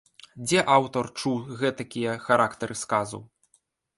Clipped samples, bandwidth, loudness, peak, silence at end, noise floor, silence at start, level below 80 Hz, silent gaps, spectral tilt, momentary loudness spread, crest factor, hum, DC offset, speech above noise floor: under 0.1%; 11.5 kHz; -26 LUFS; -4 dBFS; 0.75 s; -68 dBFS; 0.35 s; -64 dBFS; none; -4 dB/octave; 12 LU; 22 dB; none; under 0.1%; 43 dB